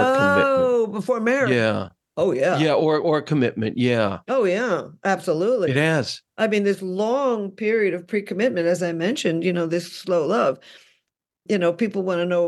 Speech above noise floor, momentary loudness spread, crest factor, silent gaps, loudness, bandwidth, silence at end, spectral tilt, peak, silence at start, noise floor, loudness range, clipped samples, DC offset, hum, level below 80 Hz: 53 dB; 6 LU; 16 dB; none; -21 LUFS; 12.5 kHz; 0 s; -6 dB/octave; -6 dBFS; 0 s; -75 dBFS; 3 LU; under 0.1%; under 0.1%; none; -66 dBFS